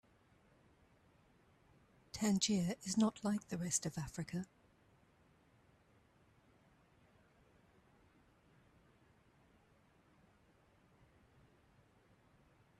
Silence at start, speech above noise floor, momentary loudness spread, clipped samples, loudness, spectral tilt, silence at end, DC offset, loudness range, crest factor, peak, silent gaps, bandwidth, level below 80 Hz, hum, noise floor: 2.15 s; 33 dB; 11 LU; under 0.1%; -38 LUFS; -4.5 dB/octave; 8.35 s; under 0.1%; 13 LU; 24 dB; -22 dBFS; none; 13.5 kHz; -72 dBFS; none; -71 dBFS